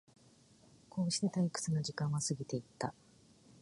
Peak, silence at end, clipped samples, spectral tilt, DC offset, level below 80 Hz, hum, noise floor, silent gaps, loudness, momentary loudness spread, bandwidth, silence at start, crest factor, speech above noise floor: -20 dBFS; 0.7 s; under 0.1%; -5 dB/octave; under 0.1%; -72 dBFS; none; -65 dBFS; none; -37 LUFS; 9 LU; 11.5 kHz; 0.95 s; 18 dB; 28 dB